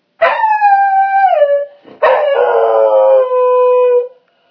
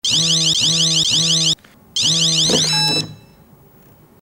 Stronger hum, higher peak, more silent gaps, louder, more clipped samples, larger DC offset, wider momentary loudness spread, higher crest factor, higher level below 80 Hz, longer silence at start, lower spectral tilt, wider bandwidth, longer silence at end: neither; about the same, 0 dBFS vs -2 dBFS; neither; first, -11 LUFS vs -14 LUFS; neither; neither; second, 5 LU vs 8 LU; second, 10 dB vs 16 dB; second, -66 dBFS vs -54 dBFS; first, 0.2 s vs 0.05 s; first, -3.5 dB/octave vs -1.5 dB/octave; second, 5.4 kHz vs 16.5 kHz; second, 0.45 s vs 1.05 s